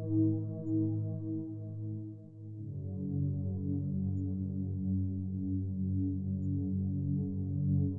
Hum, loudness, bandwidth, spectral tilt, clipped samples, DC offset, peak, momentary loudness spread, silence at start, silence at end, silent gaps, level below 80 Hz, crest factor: none; -35 LUFS; 1.2 kHz; -17 dB/octave; under 0.1%; under 0.1%; -20 dBFS; 9 LU; 0 s; 0 s; none; -68 dBFS; 14 dB